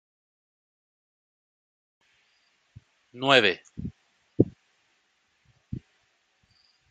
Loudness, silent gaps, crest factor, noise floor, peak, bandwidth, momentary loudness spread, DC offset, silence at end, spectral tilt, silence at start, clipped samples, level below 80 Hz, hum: -23 LUFS; none; 30 dB; -71 dBFS; -2 dBFS; 8.8 kHz; 22 LU; under 0.1%; 1.1 s; -5 dB/octave; 3.15 s; under 0.1%; -60 dBFS; none